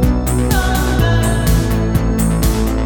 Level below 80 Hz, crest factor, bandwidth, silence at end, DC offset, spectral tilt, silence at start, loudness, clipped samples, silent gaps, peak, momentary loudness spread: -18 dBFS; 12 dB; 19 kHz; 0 s; under 0.1%; -5.5 dB/octave; 0 s; -15 LUFS; under 0.1%; none; -2 dBFS; 2 LU